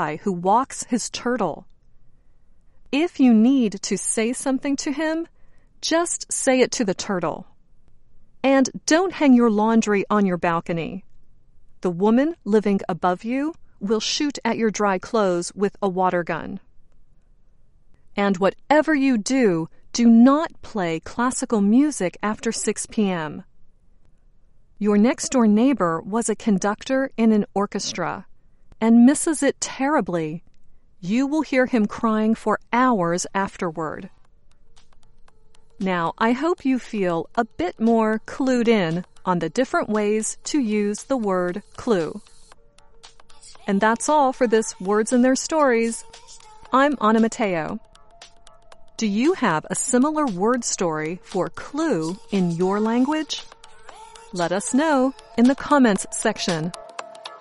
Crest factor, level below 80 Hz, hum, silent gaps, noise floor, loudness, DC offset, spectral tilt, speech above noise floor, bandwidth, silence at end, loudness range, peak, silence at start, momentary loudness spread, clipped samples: 18 dB; -52 dBFS; none; none; -51 dBFS; -21 LUFS; under 0.1%; -4.5 dB/octave; 30 dB; 11.5 kHz; 0 s; 5 LU; -4 dBFS; 0 s; 10 LU; under 0.1%